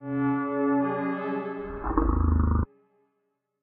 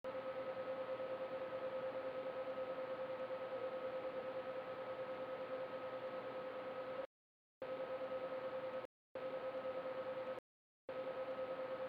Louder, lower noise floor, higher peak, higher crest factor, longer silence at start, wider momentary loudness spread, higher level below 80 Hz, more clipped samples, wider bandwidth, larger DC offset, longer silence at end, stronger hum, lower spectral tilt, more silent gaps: first, -27 LUFS vs -46 LUFS; second, -77 dBFS vs under -90 dBFS; first, -8 dBFS vs -34 dBFS; first, 18 dB vs 12 dB; about the same, 0 s vs 0.05 s; first, 8 LU vs 3 LU; first, -32 dBFS vs -84 dBFS; neither; second, 3.9 kHz vs 5.4 kHz; neither; first, 0.95 s vs 0 s; neither; first, -9 dB/octave vs -6.5 dB/octave; second, none vs 7.06-7.61 s, 8.85-9.15 s, 10.39-10.88 s